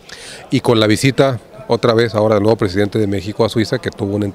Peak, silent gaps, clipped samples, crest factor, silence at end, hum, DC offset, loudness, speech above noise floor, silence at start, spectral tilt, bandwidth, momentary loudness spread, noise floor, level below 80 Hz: 0 dBFS; none; under 0.1%; 16 dB; 0 s; none; under 0.1%; -15 LUFS; 20 dB; 0.1 s; -6 dB/octave; 15.5 kHz; 7 LU; -34 dBFS; -48 dBFS